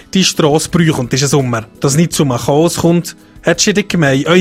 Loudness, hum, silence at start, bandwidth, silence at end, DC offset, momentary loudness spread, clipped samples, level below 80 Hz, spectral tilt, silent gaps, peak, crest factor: -12 LUFS; none; 0.15 s; 16 kHz; 0 s; under 0.1%; 6 LU; under 0.1%; -40 dBFS; -4.5 dB/octave; none; 0 dBFS; 12 dB